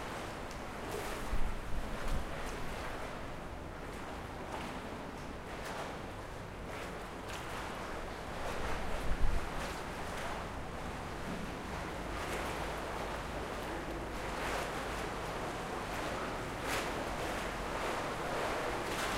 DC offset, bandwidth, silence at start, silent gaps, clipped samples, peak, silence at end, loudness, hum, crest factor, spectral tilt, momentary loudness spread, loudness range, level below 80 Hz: under 0.1%; 16 kHz; 0 s; none; under 0.1%; -16 dBFS; 0 s; -40 LUFS; none; 22 dB; -4.5 dB/octave; 7 LU; 5 LU; -44 dBFS